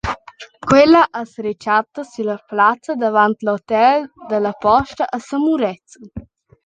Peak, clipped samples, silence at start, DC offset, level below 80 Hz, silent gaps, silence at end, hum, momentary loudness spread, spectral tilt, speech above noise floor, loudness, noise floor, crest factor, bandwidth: -2 dBFS; under 0.1%; 0.05 s; under 0.1%; -46 dBFS; none; 0.45 s; none; 17 LU; -5.5 dB/octave; 23 dB; -17 LUFS; -39 dBFS; 16 dB; 9.2 kHz